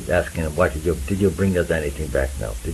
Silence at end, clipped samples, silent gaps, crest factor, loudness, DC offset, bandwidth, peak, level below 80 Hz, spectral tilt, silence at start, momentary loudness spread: 0 s; under 0.1%; none; 18 dB; -22 LUFS; under 0.1%; 14.5 kHz; -4 dBFS; -32 dBFS; -6 dB/octave; 0 s; 5 LU